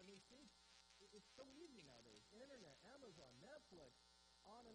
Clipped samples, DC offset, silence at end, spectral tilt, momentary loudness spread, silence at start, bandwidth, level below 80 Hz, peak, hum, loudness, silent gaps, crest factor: under 0.1%; under 0.1%; 0 s; -3.5 dB/octave; 5 LU; 0 s; 10 kHz; -84 dBFS; -48 dBFS; none; -65 LUFS; none; 18 dB